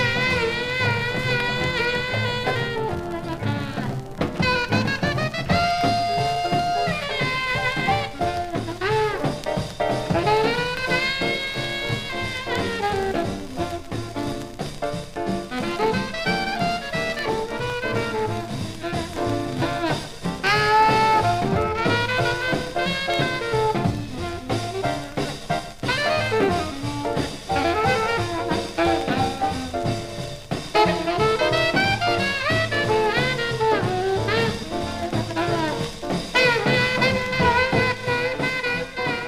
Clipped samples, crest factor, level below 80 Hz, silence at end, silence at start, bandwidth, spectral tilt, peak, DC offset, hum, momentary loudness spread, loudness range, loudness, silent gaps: under 0.1%; 16 dB; -42 dBFS; 0 s; 0 s; 15.5 kHz; -5 dB/octave; -6 dBFS; 0.2%; none; 9 LU; 5 LU; -23 LUFS; none